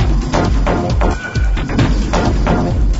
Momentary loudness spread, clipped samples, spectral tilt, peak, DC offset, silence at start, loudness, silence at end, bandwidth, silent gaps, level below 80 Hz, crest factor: 3 LU; under 0.1%; -6.5 dB/octave; -2 dBFS; under 0.1%; 0 s; -16 LUFS; 0 s; 8 kHz; none; -16 dBFS; 12 dB